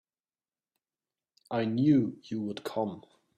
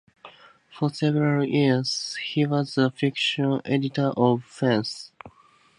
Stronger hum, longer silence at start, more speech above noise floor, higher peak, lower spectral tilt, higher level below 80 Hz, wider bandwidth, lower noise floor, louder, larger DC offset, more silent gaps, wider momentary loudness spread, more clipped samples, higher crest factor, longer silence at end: neither; first, 1.5 s vs 0.25 s; first, over 61 dB vs 27 dB; second, -14 dBFS vs -6 dBFS; first, -8 dB/octave vs -6 dB/octave; about the same, -72 dBFS vs -68 dBFS; first, 13.5 kHz vs 11 kHz; first, under -90 dBFS vs -51 dBFS; second, -30 LUFS vs -24 LUFS; neither; neither; first, 12 LU vs 7 LU; neither; about the same, 20 dB vs 20 dB; about the same, 0.4 s vs 0.5 s